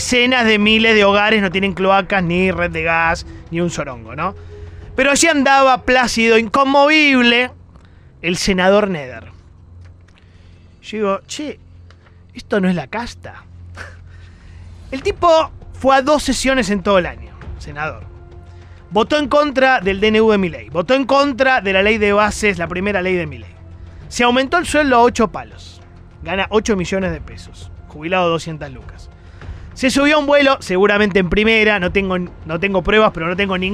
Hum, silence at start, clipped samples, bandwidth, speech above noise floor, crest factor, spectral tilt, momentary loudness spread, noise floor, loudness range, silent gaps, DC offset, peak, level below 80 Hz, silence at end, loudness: none; 0 s; under 0.1%; 15 kHz; 29 dB; 14 dB; -4 dB/octave; 18 LU; -44 dBFS; 10 LU; none; under 0.1%; -2 dBFS; -38 dBFS; 0 s; -15 LUFS